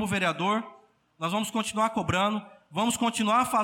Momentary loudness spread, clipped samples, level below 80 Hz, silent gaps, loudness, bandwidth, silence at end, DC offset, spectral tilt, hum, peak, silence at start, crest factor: 10 LU; under 0.1%; -58 dBFS; none; -27 LUFS; 17.5 kHz; 0 s; under 0.1%; -4 dB/octave; none; -12 dBFS; 0 s; 16 dB